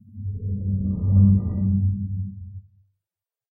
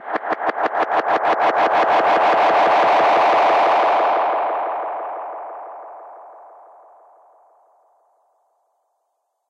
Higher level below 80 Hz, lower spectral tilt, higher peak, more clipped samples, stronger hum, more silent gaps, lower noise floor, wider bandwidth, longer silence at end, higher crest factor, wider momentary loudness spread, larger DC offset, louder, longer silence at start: first, -40 dBFS vs -68 dBFS; first, -17 dB/octave vs -4 dB/octave; about the same, -6 dBFS vs -8 dBFS; neither; neither; neither; first, under -90 dBFS vs -73 dBFS; second, 1.3 kHz vs 8.6 kHz; second, 0.9 s vs 3.05 s; first, 18 dB vs 12 dB; about the same, 17 LU vs 18 LU; neither; second, -23 LUFS vs -17 LUFS; first, 0.15 s vs 0 s